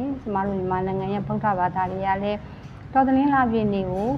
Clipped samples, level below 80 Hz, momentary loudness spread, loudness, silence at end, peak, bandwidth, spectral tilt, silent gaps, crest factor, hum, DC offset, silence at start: under 0.1%; -46 dBFS; 8 LU; -23 LUFS; 0 s; -8 dBFS; 6.4 kHz; -9 dB/octave; none; 16 dB; none; under 0.1%; 0 s